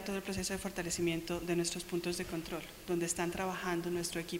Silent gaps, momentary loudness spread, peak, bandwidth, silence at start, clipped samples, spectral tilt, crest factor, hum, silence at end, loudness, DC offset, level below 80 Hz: none; 5 LU; -20 dBFS; 16 kHz; 0 s; under 0.1%; -4 dB/octave; 16 dB; none; 0 s; -37 LUFS; under 0.1%; -56 dBFS